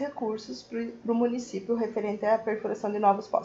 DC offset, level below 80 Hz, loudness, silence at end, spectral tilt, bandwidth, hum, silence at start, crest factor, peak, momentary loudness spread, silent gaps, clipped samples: under 0.1%; -70 dBFS; -29 LUFS; 0 s; -6 dB/octave; 8 kHz; none; 0 s; 18 dB; -10 dBFS; 10 LU; none; under 0.1%